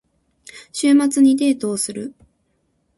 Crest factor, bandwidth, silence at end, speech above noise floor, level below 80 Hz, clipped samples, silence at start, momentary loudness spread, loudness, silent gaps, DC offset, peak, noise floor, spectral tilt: 14 dB; 11.5 kHz; 0.9 s; 50 dB; -62 dBFS; under 0.1%; 0.55 s; 17 LU; -17 LUFS; none; under 0.1%; -6 dBFS; -67 dBFS; -3.5 dB/octave